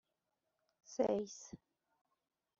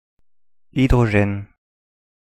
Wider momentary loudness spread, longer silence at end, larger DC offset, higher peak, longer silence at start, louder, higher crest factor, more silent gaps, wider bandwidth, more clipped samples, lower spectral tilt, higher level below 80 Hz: first, 19 LU vs 13 LU; first, 1.05 s vs 0.85 s; neither; second, -22 dBFS vs -4 dBFS; first, 0.9 s vs 0.75 s; second, -40 LUFS vs -19 LUFS; about the same, 22 dB vs 18 dB; neither; second, 7.6 kHz vs 12 kHz; neither; second, -6 dB/octave vs -8 dB/octave; second, -78 dBFS vs -32 dBFS